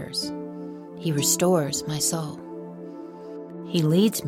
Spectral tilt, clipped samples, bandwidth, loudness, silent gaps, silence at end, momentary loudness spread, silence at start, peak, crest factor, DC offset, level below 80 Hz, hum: -4.5 dB/octave; under 0.1%; 16.5 kHz; -24 LUFS; none; 0 s; 18 LU; 0 s; -8 dBFS; 18 dB; under 0.1%; -62 dBFS; none